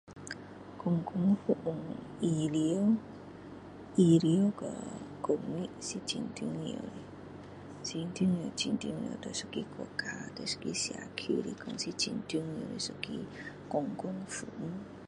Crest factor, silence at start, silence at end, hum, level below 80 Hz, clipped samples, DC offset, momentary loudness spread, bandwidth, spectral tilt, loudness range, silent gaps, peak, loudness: 20 dB; 0.05 s; 0 s; none; -66 dBFS; under 0.1%; under 0.1%; 16 LU; 11.5 kHz; -5.5 dB/octave; 6 LU; none; -14 dBFS; -34 LUFS